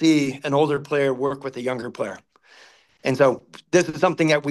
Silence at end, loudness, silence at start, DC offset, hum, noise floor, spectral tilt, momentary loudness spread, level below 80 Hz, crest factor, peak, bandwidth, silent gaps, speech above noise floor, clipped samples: 0 s; -22 LUFS; 0 s; under 0.1%; none; -52 dBFS; -5.5 dB/octave; 11 LU; -66 dBFS; 18 dB; -4 dBFS; 12.5 kHz; none; 31 dB; under 0.1%